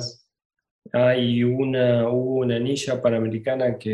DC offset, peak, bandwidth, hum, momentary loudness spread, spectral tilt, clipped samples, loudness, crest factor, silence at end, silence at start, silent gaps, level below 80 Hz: under 0.1%; -6 dBFS; 11.5 kHz; none; 5 LU; -6.5 dB/octave; under 0.1%; -22 LUFS; 16 dB; 0 s; 0 s; 0.45-0.50 s, 0.71-0.82 s; -62 dBFS